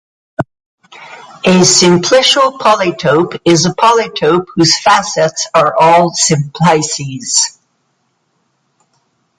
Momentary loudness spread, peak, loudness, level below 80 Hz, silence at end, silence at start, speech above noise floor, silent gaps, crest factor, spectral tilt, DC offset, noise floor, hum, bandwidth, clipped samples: 9 LU; 0 dBFS; -10 LUFS; -50 dBFS; 1.9 s; 0.4 s; 52 dB; 0.66-0.78 s; 12 dB; -3.5 dB/octave; under 0.1%; -62 dBFS; none; 11.5 kHz; under 0.1%